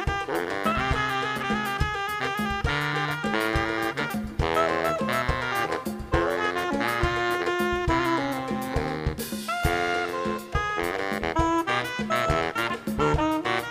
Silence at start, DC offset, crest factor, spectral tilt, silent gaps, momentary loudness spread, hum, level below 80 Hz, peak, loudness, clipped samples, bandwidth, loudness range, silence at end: 0 s; under 0.1%; 18 dB; -5 dB/octave; none; 5 LU; none; -38 dBFS; -8 dBFS; -26 LUFS; under 0.1%; 15.5 kHz; 1 LU; 0 s